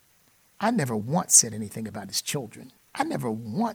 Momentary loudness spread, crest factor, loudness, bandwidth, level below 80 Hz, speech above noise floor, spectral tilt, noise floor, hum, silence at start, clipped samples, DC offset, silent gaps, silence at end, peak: 17 LU; 24 dB; -24 LUFS; 19 kHz; -68 dBFS; 36 dB; -3 dB/octave; -62 dBFS; none; 0.6 s; under 0.1%; under 0.1%; none; 0 s; -2 dBFS